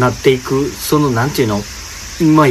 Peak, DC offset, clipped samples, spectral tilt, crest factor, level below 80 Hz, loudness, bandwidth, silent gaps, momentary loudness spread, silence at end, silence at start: 0 dBFS; under 0.1%; under 0.1%; -5.5 dB/octave; 14 dB; -36 dBFS; -15 LUFS; 15.5 kHz; none; 13 LU; 0 s; 0 s